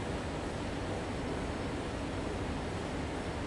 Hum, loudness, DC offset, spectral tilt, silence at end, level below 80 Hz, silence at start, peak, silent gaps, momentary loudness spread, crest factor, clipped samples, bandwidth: none; -37 LUFS; under 0.1%; -5.5 dB/octave; 0 s; -46 dBFS; 0 s; -24 dBFS; none; 1 LU; 12 dB; under 0.1%; 11.5 kHz